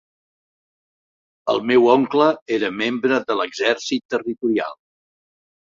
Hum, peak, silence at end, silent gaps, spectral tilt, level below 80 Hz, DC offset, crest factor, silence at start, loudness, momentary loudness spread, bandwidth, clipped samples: none; -2 dBFS; 0.85 s; 2.42-2.46 s, 4.05-4.09 s; -4.5 dB/octave; -66 dBFS; under 0.1%; 20 dB; 1.45 s; -19 LUFS; 8 LU; 7.6 kHz; under 0.1%